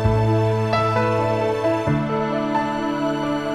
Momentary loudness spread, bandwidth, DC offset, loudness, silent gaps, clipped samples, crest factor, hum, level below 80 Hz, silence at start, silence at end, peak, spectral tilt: 4 LU; 10.5 kHz; under 0.1%; -21 LUFS; none; under 0.1%; 14 dB; none; -40 dBFS; 0 s; 0 s; -6 dBFS; -7.5 dB/octave